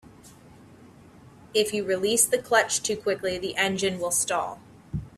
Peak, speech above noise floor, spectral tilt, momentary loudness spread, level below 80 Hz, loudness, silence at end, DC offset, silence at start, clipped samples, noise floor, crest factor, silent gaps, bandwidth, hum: -6 dBFS; 25 dB; -2 dB/octave; 11 LU; -54 dBFS; -25 LUFS; 0.1 s; under 0.1%; 0.05 s; under 0.1%; -50 dBFS; 20 dB; none; 15.5 kHz; none